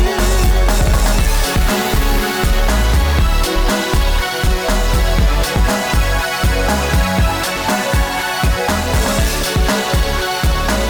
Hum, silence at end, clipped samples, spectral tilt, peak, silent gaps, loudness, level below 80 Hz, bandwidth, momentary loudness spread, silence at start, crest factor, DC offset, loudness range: none; 0 s; under 0.1%; -4 dB/octave; -4 dBFS; none; -16 LUFS; -16 dBFS; over 20 kHz; 2 LU; 0 s; 10 dB; under 0.1%; 1 LU